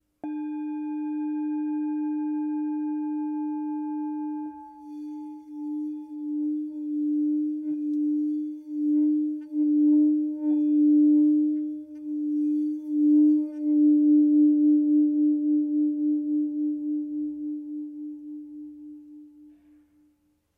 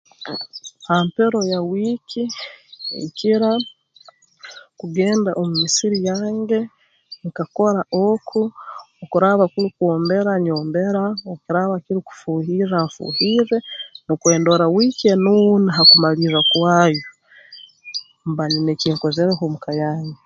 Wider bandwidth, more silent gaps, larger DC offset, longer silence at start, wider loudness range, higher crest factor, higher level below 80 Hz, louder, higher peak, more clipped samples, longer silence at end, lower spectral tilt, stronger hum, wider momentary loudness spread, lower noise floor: second, 2.6 kHz vs 8.8 kHz; neither; neither; about the same, 0.25 s vs 0.2 s; first, 12 LU vs 8 LU; second, 12 dB vs 18 dB; second, -80 dBFS vs -62 dBFS; second, -25 LUFS vs -18 LUFS; second, -14 dBFS vs 0 dBFS; neither; first, 1.1 s vs 0.1 s; first, -9 dB/octave vs -4.5 dB/octave; neither; about the same, 18 LU vs 16 LU; first, -68 dBFS vs -50 dBFS